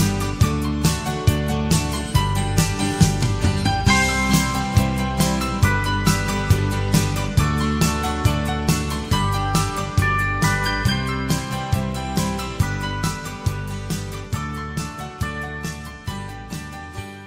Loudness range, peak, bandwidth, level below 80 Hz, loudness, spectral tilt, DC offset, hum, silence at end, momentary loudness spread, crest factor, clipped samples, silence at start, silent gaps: 8 LU; -2 dBFS; 16 kHz; -30 dBFS; -21 LUFS; -5 dB/octave; under 0.1%; none; 0 s; 10 LU; 20 dB; under 0.1%; 0 s; none